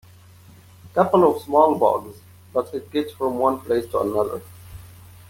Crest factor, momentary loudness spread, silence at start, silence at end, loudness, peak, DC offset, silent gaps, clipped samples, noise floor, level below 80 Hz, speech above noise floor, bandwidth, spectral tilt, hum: 20 dB; 19 LU; 0.85 s; 0.45 s; -21 LUFS; -2 dBFS; under 0.1%; none; under 0.1%; -48 dBFS; -56 dBFS; 27 dB; 17 kHz; -7 dB/octave; none